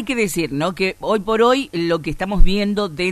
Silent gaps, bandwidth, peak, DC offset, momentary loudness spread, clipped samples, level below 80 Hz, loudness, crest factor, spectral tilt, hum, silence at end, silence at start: none; 13 kHz; 0 dBFS; under 0.1%; 6 LU; under 0.1%; -22 dBFS; -19 LUFS; 16 dB; -5 dB/octave; none; 0 s; 0 s